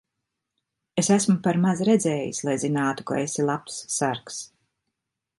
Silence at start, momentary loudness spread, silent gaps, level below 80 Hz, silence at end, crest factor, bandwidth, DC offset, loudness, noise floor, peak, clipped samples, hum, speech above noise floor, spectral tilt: 0.95 s; 11 LU; none; -66 dBFS; 0.95 s; 18 dB; 11.5 kHz; under 0.1%; -24 LUFS; -82 dBFS; -6 dBFS; under 0.1%; none; 59 dB; -5 dB/octave